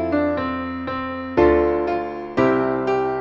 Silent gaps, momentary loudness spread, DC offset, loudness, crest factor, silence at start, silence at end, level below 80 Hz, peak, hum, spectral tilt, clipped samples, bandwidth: none; 10 LU; under 0.1%; -21 LUFS; 16 dB; 0 s; 0 s; -40 dBFS; -4 dBFS; none; -8 dB/octave; under 0.1%; 7 kHz